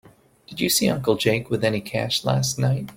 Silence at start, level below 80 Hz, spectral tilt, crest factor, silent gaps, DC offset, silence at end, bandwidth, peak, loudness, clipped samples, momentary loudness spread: 0.5 s; -54 dBFS; -4.5 dB/octave; 18 dB; none; under 0.1%; 0.05 s; 17 kHz; -4 dBFS; -22 LUFS; under 0.1%; 6 LU